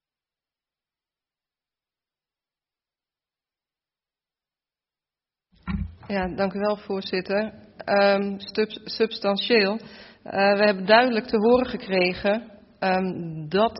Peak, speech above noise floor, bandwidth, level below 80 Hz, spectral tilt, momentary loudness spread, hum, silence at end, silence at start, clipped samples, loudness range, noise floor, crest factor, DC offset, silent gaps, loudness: -4 dBFS; over 67 dB; 5.8 kHz; -50 dBFS; -3 dB/octave; 13 LU; none; 0 s; 5.65 s; under 0.1%; 12 LU; under -90 dBFS; 22 dB; under 0.1%; none; -23 LUFS